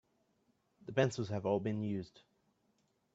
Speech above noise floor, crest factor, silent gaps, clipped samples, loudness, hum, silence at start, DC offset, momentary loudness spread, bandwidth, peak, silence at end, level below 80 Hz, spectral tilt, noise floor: 41 dB; 22 dB; none; under 0.1%; -37 LUFS; none; 0.85 s; under 0.1%; 14 LU; 8 kHz; -16 dBFS; 0.95 s; -74 dBFS; -6.5 dB/octave; -77 dBFS